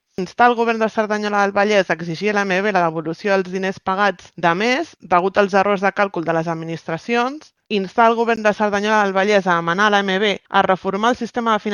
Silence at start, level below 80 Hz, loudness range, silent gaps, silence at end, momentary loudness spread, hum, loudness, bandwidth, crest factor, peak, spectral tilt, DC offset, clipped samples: 0.2 s; -60 dBFS; 2 LU; none; 0 s; 7 LU; none; -18 LUFS; 10.5 kHz; 18 dB; 0 dBFS; -5 dB/octave; under 0.1%; under 0.1%